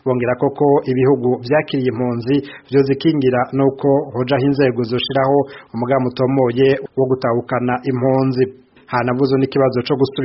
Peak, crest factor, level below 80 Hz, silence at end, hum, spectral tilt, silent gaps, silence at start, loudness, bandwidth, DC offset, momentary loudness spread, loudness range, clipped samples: -2 dBFS; 14 dB; -52 dBFS; 0 s; none; -6 dB/octave; none; 0.05 s; -17 LUFS; 5.8 kHz; under 0.1%; 5 LU; 1 LU; under 0.1%